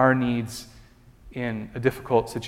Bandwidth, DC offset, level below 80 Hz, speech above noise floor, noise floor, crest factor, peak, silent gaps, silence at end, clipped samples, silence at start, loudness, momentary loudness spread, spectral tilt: 16 kHz; under 0.1%; -50 dBFS; 27 dB; -51 dBFS; 22 dB; -4 dBFS; none; 0 s; under 0.1%; 0 s; -26 LUFS; 17 LU; -6.5 dB/octave